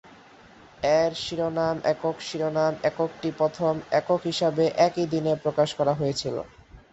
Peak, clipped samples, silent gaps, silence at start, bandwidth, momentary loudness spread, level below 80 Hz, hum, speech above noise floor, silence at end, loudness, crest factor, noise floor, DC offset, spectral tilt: -8 dBFS; under 0.1%; none; 0.1 s; 8.2 kHz; 7 LU; -58 dBFS; none; 26 dB; 0.15 s; -25 LUFS; 18 dB; -51 dBFS; under 0.1%; -5.5 dB/octave